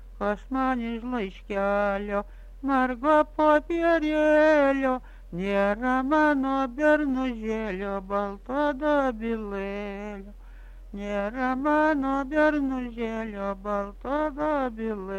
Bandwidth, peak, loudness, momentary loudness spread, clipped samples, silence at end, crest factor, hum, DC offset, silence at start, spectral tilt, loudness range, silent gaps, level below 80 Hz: 9.2 kHz; -8 dBFS; -26 LUFS; 11 LU; under 0.1%; 0 s; 16 dB; none; under 0.1%; 0 s; -6.5 dB/octave; 6 LU; none; -44 dBFS